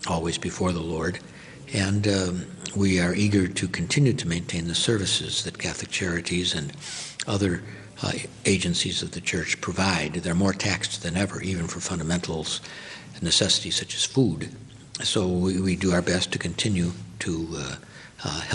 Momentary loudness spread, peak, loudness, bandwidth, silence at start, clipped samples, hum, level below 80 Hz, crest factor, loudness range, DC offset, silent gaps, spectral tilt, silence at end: 11 LU; -6 dBFS; -25 LUFS; 11 kHz; 0 s; under 0.1%; none; -50 dBFS; 20 dB; 3 LU; under 0.1%; none; -4 dB/octave; 0 s